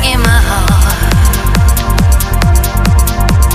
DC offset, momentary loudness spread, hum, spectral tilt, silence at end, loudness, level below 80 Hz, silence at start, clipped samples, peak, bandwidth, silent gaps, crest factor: 0.5%; 1 LU; none; -4.5 dB/octave; 0 s; -10 LUFS; -10 dBFS; 0 s; under 0.1%; 0 dBFS; 15.5 kHz; none; 8 dB